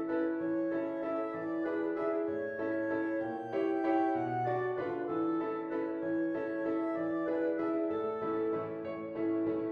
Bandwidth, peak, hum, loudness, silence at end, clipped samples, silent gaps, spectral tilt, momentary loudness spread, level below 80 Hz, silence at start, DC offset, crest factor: 4.8 kHz; -20 dBFS; none; -34 LUFS; 0 s; under 0.1%; none; -9 dB/octave; 4 LU; -74 dBFS; 0 s; under 0.1%; 14 dB